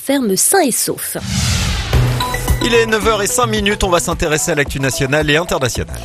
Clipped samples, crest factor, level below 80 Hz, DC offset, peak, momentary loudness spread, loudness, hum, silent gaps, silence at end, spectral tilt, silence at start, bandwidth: under 0.1%; 14 dB; -26 dBFS; under 0.1%; 0 dBFS; 5 LU; -15 LUFS; none; none; 0 s; -3.5 dB/octave; 0 s; 15 kHz